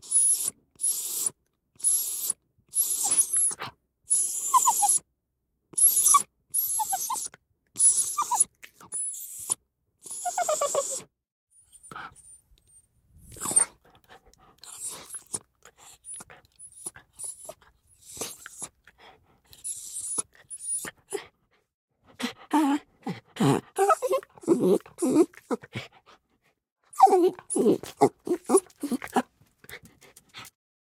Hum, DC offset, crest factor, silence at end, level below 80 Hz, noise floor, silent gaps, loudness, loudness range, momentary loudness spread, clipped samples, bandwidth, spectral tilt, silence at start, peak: none; under 0.1%; 24 dB; 0.35 s; -70 dBFS; -78 dBFS; 11.32-11.47 s, 21.74-21.88 s, 26.72-26.76 s; -25 LUFS; 17 LU; 21 LU; under 0.1%; 16 kHz; -3 dB/octave; 0.05 s; -6 dBFS